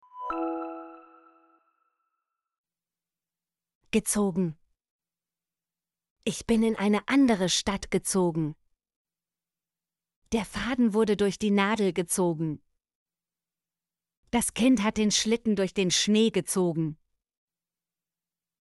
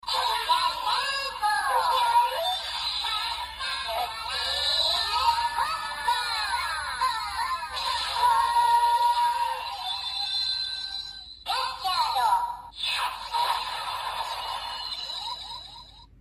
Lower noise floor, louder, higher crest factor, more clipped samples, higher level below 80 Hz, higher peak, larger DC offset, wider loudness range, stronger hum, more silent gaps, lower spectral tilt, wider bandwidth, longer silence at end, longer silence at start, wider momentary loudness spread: first, under -90 dBFS vs -48 dBFS; about the same, -26 LUFS vs -26 LUFS; about the same, 18 dB vs 16 dB; neither; about the same, -56 dBFS vs -54 dBFS; about the same, -12 dBFS vs -10 dBFS; neither; first, 7 LU vs 3 LU; neither; first, 2.58-2.64 s, 3.75-3.81 s, 4.91-4.99 s, 6.10-6.16 s, 8.96-9.05 s, 10.16-10.22 s, 12.95-13.06 s, 14.17-14.23 s vs none; first, -4 dB/octave vs 0.5 dB/octave; second, 12 kHz vs 15 kHz; first, 1.65 s vs 0.15 s; about the same, 0.15 s vs 0.05 s; about the same, 10 LU vs 10 LU